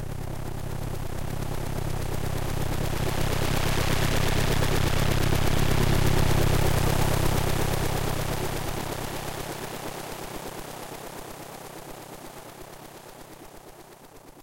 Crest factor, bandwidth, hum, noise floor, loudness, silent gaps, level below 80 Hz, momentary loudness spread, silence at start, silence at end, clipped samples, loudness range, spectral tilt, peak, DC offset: 16 dB; 16 kHz; none; -48 dBFS; -28 LUFS; none; -32 dBFS; 19 LU; 0 s; 0 s; under 0.1%; 15 LU; -5 dB/octave; -10 dBFS; 0.4%